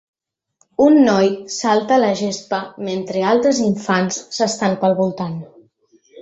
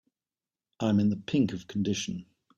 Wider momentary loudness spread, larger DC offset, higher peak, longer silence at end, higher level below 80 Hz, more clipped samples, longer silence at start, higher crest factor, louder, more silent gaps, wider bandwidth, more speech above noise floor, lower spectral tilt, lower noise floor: first, 12 LU vs 8 LU; neither; first, -2 dBFS vs -14 dBFS; second, 0 s vs 0.35 s; about the same, -60 dBFS vs -64 dBFS; neither; about the same, 0.8 s vs 0.8 s; about the same, 16 dB vs 16 dB; first, -17 LUFS vs -29 LUFS; neither; about the same, 8.2 kHz vs 8 kHz; second, 46 dB vs over 62 dB; about the same, -5 dB/octave vs -6 dB/octave; second, -63 dBFS vs under -90 dBFS